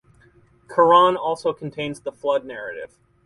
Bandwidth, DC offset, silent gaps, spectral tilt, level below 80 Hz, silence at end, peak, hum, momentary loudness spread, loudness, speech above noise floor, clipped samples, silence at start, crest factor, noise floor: 11.5 kHz; under 0.1%; none; -5.5 dB/octave; -62 dBFS; 0.4 s; -4 dBFS; none; 19 LU; -20 LUFS; 35 dB; under 0.1%; 0.7 s; 18 dB; -55 dBFS